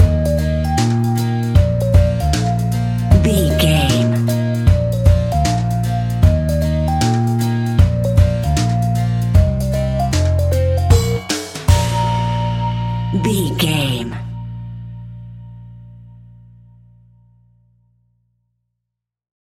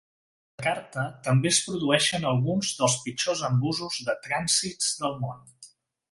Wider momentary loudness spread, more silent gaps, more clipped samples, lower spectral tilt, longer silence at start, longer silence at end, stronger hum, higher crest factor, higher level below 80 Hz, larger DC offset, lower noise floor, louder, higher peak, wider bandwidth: about the same, 9 LU vs 8 LU; neither; neither; first, -6.5 dB/octave vs -3.5 dB/octave; second, 0 s vs 0.6 s; first, 3.4 s vs 0.45 s; first, 60 Hz at -40 dBFS vs none; second, 16 dB vs 22 dB; first, -24 dBFS vs -62 dBFS; neither; first, -80 dBFS vs -54 dBFS; first, -16 LUFS vs -26 LUFS; first, 0 dBFS vs -6 dBFS; first, 17 kHz vs 11.5 kHz